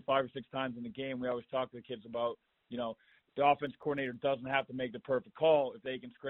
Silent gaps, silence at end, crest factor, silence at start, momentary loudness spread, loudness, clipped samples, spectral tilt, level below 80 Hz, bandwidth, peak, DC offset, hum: none; 0 s; 20 dB; 0.1 s; 12 LU; -35 LUFS; under 0.1%; -3 dB/octave; -72 dBFS; 4.1 kHz; -16 dBFS; under 0.1%; none